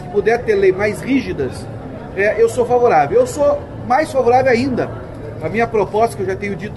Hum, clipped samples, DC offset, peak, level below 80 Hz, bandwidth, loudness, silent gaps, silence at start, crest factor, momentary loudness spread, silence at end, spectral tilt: none; under 0.1%; under 0.1%; -4 dBFS; -40 dBFS; 12.5 kHz; -16 LUFS; none; 0 s; 12 dB; 13 LU; 0 s; -6 dB/octave